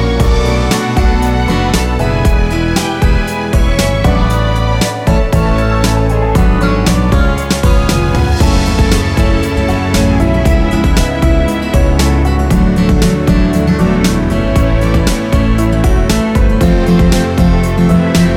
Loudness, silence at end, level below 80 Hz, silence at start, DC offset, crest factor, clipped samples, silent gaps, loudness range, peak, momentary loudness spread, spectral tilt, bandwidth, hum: -12 LUFS; 0 s; -14 dBFS; 0 s; under 0.1%; 10 dB; under 0.1%; none; 1 LU; 0 dBFS; 3 LU; -6 dB/octave; 16 kHz; none